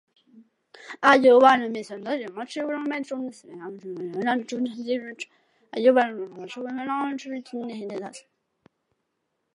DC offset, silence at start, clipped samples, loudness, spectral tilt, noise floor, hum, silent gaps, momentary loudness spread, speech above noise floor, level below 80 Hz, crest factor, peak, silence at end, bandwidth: under 0.1%; 0.35 s; under 0.1%; -24 LUFS; -4.5 dB/octave; -78 dBFS; none; none; 20 LU; 54 dB; -84 dBFS; 22 dB; -4 dBFS; 1.35 s; 11 kHz